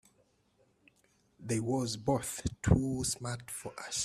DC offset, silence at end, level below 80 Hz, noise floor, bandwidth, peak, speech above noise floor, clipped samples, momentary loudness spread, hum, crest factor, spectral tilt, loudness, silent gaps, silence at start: under 0.1%; 0 s; -50 dBFS; -71 dBFS; 15.5 kHz; -12 dBFS; 38 dB; under 0.1%; 12 LU; none; 24 dB; -5 dB/octave; -34 LUFS; none; 1.4 s